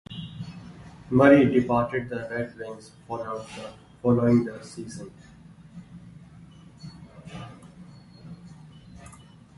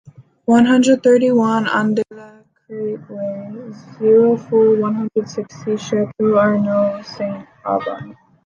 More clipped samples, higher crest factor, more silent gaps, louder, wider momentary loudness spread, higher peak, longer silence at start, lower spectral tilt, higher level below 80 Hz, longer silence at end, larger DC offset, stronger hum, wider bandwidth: neither; first, 22 dB vs 14 dB; neither; second, -23 LUFS vs -16 LUFS; first, 27 LU vs 15 LU; about the same, -4 dBFS vs -2 dBFS; about the same, 0.1 s vs 0.05 s; first, -7.5 dB/octave vs -6 dB/octave; first, -56 dBFS vs -64 dBFS; about the same, 0.45 s vs 0.35 s; neither; neither; first, 11.5 kHz vs 9.6 kHz